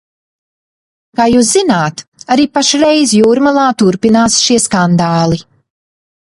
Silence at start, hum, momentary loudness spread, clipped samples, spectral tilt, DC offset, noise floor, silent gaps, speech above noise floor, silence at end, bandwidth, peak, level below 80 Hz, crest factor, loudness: 1.2 s; none; 7 LU; under 0.1%; -4 dB/octave; under 0.1%; under -90 dBFS; 2.08-2.12 s; over 80 dB; 1 s; 11.5 kHz; 0 dBFS; -46 dBFS; 12 dB; -10 LUFS